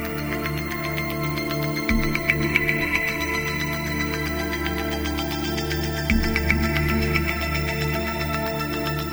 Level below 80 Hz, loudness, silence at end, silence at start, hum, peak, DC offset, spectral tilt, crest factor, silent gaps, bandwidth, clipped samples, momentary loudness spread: -32 dBFS; -24 LUFS; 0 s; 0 s; none; -2 dBFS; under 0.1%; -5 dB/octave; 22 dB; none; over 20 kHz; under 0.1%; 5 LU